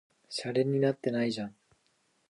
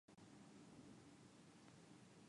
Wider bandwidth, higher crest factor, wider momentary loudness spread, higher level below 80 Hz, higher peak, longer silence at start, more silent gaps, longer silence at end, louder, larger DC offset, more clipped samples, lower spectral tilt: about the same, 11.5 kHz vs 11 kHz; about the same, 18 dB vs 14 dB; first, 11 LU vs 3 LU; first, -76 dBFS vs -88 dBFS; first, -14 dBFS vs -52 dBFS; first, 0.3 s vs 0.1 s; neither; first, 0.8 s vs 0 s; first, -31 LUFS vs -65 LUFS; neither; neither; about the same, -6 dB/octave vs -5 dB/octave